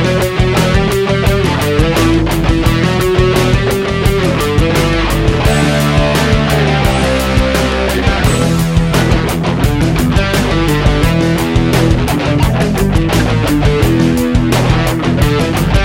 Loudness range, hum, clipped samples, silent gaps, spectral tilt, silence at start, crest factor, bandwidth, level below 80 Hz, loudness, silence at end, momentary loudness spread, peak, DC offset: 1 LU; none; under 0.1%; none; -6 dB/octave; 0 s; 10 dB; 16.5 kHz; -18 dBFS; -12 LUFS; 0 s; 2 LU; 0 dBFS; under 0.1%